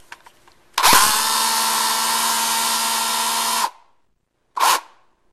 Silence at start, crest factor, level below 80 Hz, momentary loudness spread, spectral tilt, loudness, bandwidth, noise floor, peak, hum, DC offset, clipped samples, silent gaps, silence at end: 0 s; 20 dB; -54 dBFS; 9 LU; 1 dB/octave; -17 LUFS; 15 kHz; -66 dBFS; 0 dBFS; none; under 0.1%; under 0.1%; none; 0.5 s